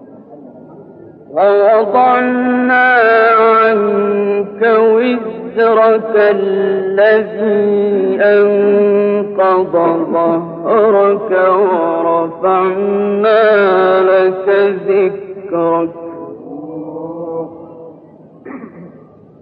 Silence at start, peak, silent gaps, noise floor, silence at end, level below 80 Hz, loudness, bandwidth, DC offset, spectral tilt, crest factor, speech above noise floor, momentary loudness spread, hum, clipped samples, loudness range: 0 s; -2 dBFS; none; -40 dBFS; 0.45 s; -62 dBFS; -12 LUFS; 5 kHz; under 0.1%; -9.5 dB/octave; 10 dB; 29 dB; 15 LU; none; under 0.1%; 8 LU